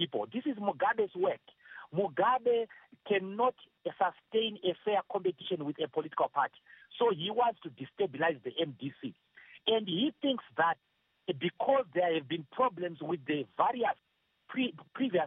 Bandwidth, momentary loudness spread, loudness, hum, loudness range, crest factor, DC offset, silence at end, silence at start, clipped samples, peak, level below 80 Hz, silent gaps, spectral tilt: 3.9 kHz; 12 LU; -33 LUFS; none; 2 LU; 20 dB; under 0.1%; 0 s; 0 s; under 0.1%; -14 dBFS; -84 dBFS; none; -2.5 dB/octave